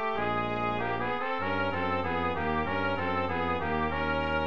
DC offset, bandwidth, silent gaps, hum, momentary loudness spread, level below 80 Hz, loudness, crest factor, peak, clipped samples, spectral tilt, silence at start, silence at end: 0.8%; 7.4 kHz; none; none; 1 LU; -48 dBFS; -30 LUFS; 14 dB; -16 dBFS; under 0.1%; -7.5 dB/octave; 0 s; 0 s